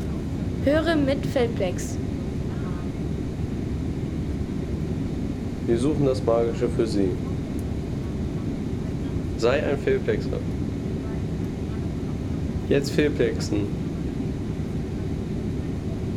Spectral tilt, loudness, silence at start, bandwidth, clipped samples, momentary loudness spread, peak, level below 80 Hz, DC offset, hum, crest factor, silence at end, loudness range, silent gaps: -7 dB/octave; -26 LUFS; 0 s; 17 kHz; under 0.1%; 7 LU; -8 dBFS; -36 dBFS; under 0.1%; none; 18 dB; 0 s; 3 LU; none